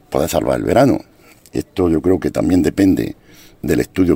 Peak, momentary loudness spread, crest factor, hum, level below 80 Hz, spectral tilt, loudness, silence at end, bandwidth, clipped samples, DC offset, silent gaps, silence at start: 0 dBFS; 12 LU; 16 dB; none; -38 dBFS; -6.5 dB/octave; -16 LUFS; 0 s; 16.5 kHz; under 0.1%; under 0.1%; none; 0.1 s